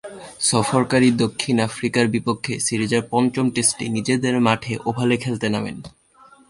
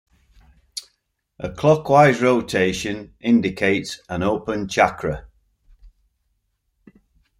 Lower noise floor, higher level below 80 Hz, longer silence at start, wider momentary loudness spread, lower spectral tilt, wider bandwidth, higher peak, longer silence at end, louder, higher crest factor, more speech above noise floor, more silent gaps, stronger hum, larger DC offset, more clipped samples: second, -51 dBFS vs -72 dBFS; second, -54 dBFS vs -48 dBFS; second, 0.05 s vs 0.75 s; second, 7 LU vs 19 LU; about the same, -4.5 dB/octave vs -5.5 dB/octave; second, 11.5 kHz vs 15.5 kHz; about the same, -2 dBFS vs -2 dBFS; second, 0.6 s vs 1.5 s; about the same, -20 LUFS vs -19 LUFS; about the same, 20 dB vs 20 dB; second, 31 dB vs 53 dB; neither; neither; neither; neither